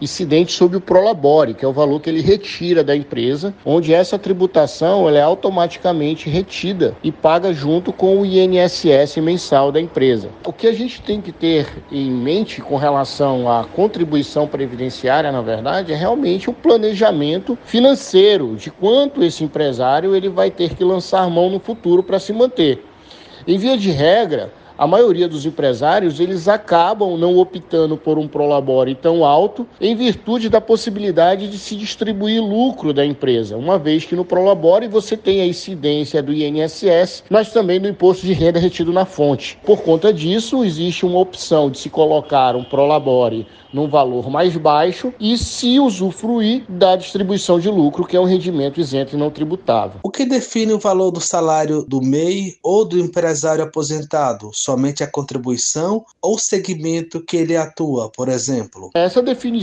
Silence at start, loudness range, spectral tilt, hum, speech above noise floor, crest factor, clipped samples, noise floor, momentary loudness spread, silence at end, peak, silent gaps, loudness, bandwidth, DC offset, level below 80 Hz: 0 s; 3 LU; -5.5 dB/octave; none; 25 dB; 16 dB; under 0.1%; -41 dBFS; 7 LU; 0 s; 0 dBFS; none; -16 LUFS; 9.4 kHz; under 0.1%; -48 dBFS